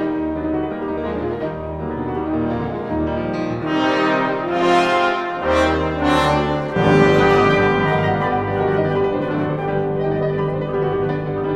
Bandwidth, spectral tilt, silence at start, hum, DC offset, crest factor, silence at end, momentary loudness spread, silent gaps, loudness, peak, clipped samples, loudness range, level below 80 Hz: 11 kHz; -7 dB/octave; 0 s; none; under 0.1%; 18 dB; 0 s; 9 LU; none; -19 LUFS; 0 dBFS; under 0.1%; 7 LU; -38 dBFS